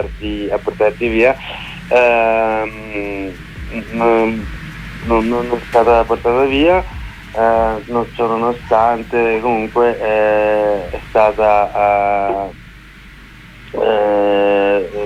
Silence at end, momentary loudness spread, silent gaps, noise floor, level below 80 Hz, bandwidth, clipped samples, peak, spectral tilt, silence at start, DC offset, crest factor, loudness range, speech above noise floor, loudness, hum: 0 s; 14 LU; none; -38 dBFS; -34 dBFS; 13.5 kHz; under 0.1%; 0 dBFS; -6.5 dB/octave; 0 s; under 0.1%; 14 dB; 2 LU; 23 dB; -15 LUFS; none